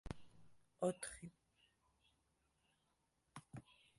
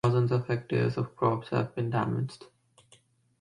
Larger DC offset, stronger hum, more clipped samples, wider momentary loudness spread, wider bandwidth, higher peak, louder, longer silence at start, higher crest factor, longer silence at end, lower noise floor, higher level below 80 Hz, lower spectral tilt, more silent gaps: neither; neither; neither; first, 18 LU vs 6 LU; first, 11.5 kHz vs 10 kHz; second, -28 dBFS vs -12 dBFS; second, -48 LUFS vs -30 LUFS; about the same, 0.05 s vs 0.05 s; first, 26 dB vs 16 dB; second, 0.25 s vs 0.95 s; first, -84 dBFS vs -63 dBFS; second, -68 dBFS vs -62 dBFS; second, -5 dB/octave vs -8.5 dB/octave; neither